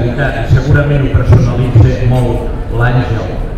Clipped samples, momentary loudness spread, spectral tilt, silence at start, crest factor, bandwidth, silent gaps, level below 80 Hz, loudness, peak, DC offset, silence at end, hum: under 0.1%; 8 LU; -8.5 dB/octave; 0 s; 10 dB; 8.8 kHz; none; -18 dBFS; -11 LUFS; 0 dBFS; under 0.1%; 0 s; none